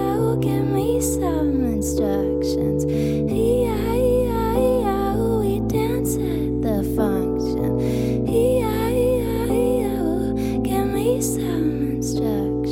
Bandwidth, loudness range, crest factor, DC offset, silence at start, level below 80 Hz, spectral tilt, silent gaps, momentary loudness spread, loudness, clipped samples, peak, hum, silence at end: 17 kHz; 1 LU; 12 dB; under 0.1%; 0 s; -34 dBFS; -6.5 dB/octave; none; 3 LU; -21 LUFS; under 0.1%; -8 dBFS; none; 0 s